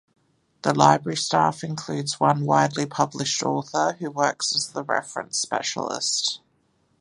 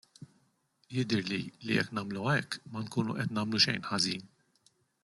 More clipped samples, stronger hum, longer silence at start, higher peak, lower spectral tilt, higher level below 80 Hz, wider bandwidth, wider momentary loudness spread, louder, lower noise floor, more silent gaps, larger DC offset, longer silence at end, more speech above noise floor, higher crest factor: neither; neither; first, 0.65 s vs 0.2 s; first, -2 dBFS vs -12 dBFS; about the same, -3.5 dB/octave vs -4.5 dB/octave; about the same, -66 dBFS vs -70 dBFS; about the same, 11.5 kHz vs 12 kHz; about the same, 9 LU vs 11 LU; first, -23 LUFS vs -32 LUFS; second, -66 dBFS vs -72 dBFS; neither; neither; second, 0.65 s vs 0.8 s; about the same, 43 dB vs 40 dB; about the same, 22 dB vs 22 dB